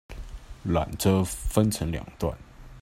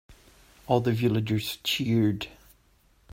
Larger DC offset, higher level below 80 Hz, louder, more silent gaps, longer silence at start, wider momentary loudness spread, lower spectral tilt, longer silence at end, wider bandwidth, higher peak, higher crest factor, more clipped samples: neither; first, -40 dBFS vs -56 dBFS; about the same, -27 LUFS vs -26 LUFS; neither; about the same, 0.1 s vs 0.1 s; first, 19 LU vs 6 LU; about the same, -6 dB/octave vs -6 dB/octave; second, 0 s vs 0.85 s; about the same, 16 kHz vs 16 kHz; about the same, -6 dBFS vs -8 dBFS; about the same, 20 dB vs 20 dB; neither